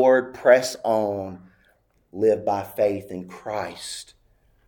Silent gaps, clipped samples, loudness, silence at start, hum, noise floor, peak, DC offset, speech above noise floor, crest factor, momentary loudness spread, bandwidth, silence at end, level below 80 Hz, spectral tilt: none; under 0.1%; -23 LUFS; 0 s; none; -63 dBFS; -2 dBFS; under 0.1%; 41 dB; 20 dB; 18 LU; 19 kHz; 0.65 s; -64 dBFS; -4.5 dB/octave